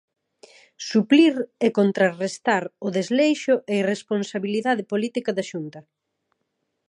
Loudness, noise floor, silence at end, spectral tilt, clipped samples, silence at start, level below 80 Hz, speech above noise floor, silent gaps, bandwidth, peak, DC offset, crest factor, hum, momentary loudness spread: -22 LUFS; -76 dBFS; 1.1 s; -5.5 dB/octave; under 0.1%; 0.8 s; -78 dBFS; 55 dB; none; 11 kHz; -4 dBFS; under 0.1%; 18 dB; none; 10 LU